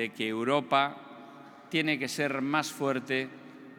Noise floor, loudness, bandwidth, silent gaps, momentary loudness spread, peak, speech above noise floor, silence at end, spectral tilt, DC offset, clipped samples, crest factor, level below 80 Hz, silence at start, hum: -50 dBFS; -30 LUFS; 19 kHz; none; 21 LU; -10 dBFS; 20 dB; 0 s; -4.5 dB/octave; under 0.1%; under 0.1%; 22 dB; under -90 dBFS; 0 s; none